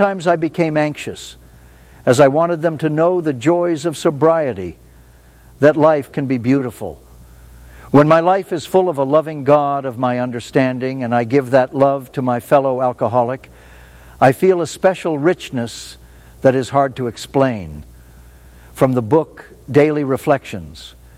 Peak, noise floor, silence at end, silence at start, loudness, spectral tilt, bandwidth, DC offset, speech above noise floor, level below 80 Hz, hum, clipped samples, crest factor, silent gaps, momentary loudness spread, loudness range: 0 dBFS; -45 dBFS; 0.3 s; 0 s; -16 LUFS; -6.5 dB/octave; 16 kHz; under 0.1%; 29 dB; -48 dBFS; none; under 0.1%; 16 dB; none; 15 LU; 3 LU